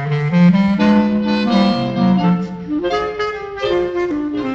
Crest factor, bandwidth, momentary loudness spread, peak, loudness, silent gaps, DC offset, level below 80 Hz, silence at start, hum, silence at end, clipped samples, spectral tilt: 14 dB; 7.2 kHz; 9 LU; -2 dBFS; -16 LUFS; none; under 0.1%; -44 dBFS; 0 s; none; 0 s; under 0.1%; -8 dB/octave